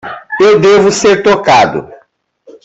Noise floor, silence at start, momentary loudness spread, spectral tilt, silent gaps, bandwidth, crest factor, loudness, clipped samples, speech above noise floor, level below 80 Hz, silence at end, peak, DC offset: -49 dBFS; 0.05 s; 10 LU; -4 dB/octave; none; 8.2 kHz; 10 dB; -8 LUFS; under 0.1%; 42 dB; -46 dBFS; 0.7 s; 0 dBFS; under 0.1%